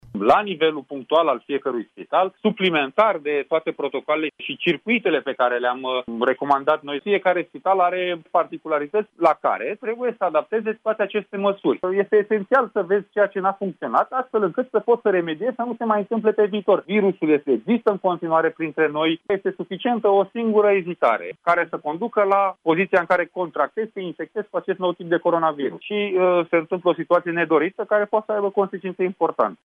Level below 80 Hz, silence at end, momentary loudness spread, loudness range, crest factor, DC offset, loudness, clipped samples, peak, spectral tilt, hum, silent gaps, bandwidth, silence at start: -68 dBFS; 0.1 s; 7 LU; 2 LU; 16 dB; under 0.1%; -21 LUFS; under 0.1%; -6 dBFS; -7.5 dB/octave; none; none; 5.4 kHz; 0.15 s